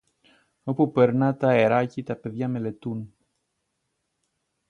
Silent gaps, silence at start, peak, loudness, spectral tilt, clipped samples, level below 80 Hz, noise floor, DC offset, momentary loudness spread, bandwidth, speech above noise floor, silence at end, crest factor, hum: none; 0.65 s; -6 dBFS; -24 LUFS; -9 dB/octave; under 0.1%; -66 dBFS; -77 dBFS; under 0.1%; 14 LU; 9.6 kHz; 54 dB; 1.6 s; 20 dB; none